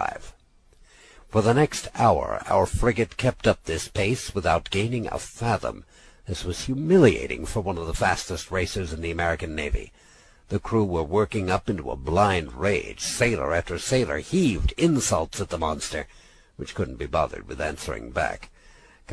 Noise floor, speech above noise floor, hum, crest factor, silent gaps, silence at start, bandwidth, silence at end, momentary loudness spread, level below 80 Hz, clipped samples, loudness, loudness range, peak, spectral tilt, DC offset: -56 dBFS; 32 dB; none; 20 dB; none; 0 s; 11 kHz; 0 s; 10 LU; -38 dBFS; under 0.1%; -25 LUFS; 4 LU; -6 dBFS; -5 dB/octave; under 0.1%